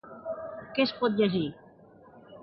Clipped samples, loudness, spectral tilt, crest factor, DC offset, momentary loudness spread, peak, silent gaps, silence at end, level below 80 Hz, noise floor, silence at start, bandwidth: under 0.1%; -29 LUFS; -9 dB/octave; 18 dB; under 0.1%; 12 LU; -12 dBFS; none; 0 s; -68 dBFS; -54 dBFS; 0.05 s; 6 kHz